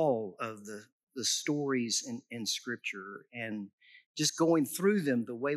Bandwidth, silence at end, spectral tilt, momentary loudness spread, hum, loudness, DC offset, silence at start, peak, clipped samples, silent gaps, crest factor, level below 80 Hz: 14 kHz; 0 s; -3.5 dB/octave; 17 LU; none; -32 LUFS; under 0.1%; 0 s; -16 dBFS; under 0.1%; 0.92-1.07 s, 3.73-3.78 s, 4.06-4.14 s; 18 dB; under -90 dBFS